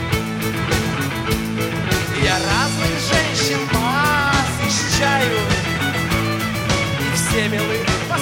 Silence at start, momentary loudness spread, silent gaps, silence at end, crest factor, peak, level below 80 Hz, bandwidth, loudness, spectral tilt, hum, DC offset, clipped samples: 0 s; 5 LU; none; 0 s; 16 dB; -2 dBFS; -34 dBFS; 17 kHz; -18 LUFS; -4 dB/octave; none; under 0.1%; under 0.1%